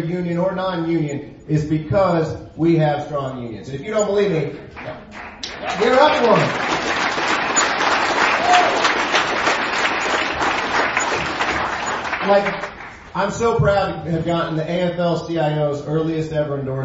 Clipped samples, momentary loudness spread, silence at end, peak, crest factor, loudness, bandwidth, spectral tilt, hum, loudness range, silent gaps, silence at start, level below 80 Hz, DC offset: under 0.1%; 13 LU; 0 s; 0 dBFS; 20 dB; -19 LUFS; 8 kHz; -4.5 dB/octave; none; 4 LU; none; 0 s; -46 dBFS; under 0.1%